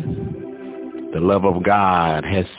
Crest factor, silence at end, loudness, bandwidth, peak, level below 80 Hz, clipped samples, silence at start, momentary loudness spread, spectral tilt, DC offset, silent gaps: 16 dB; 0 s; -18 LUFS; 4 kHz; -4 dBFS; -40 dBFS; under 0.1%; 0 s; 16 LU; -11 dB/octave; under 0.1%; none